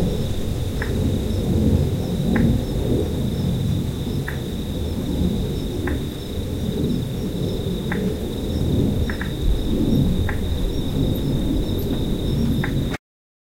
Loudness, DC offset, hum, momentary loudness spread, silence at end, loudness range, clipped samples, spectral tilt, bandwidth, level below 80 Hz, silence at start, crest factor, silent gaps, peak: -23 LUFS; under 0.1%; none; 6 LU; 0.45 s; 3 LU; under 0.1%; -7 dB/octave; 16.5 kHz; -28 dBFS; 0 s; 16 dB; none; -6 dBFS